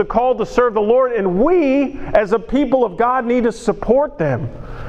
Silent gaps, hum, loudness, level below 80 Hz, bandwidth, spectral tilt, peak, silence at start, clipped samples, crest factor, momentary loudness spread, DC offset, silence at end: none; none; -16 LUFS; -36 dBFS; 9.6 kHz; -7.5 dB/octave; 0 dBFS; 0 s; under 0.1%; 16 dB; 5 LU; under 0.1%; 0 s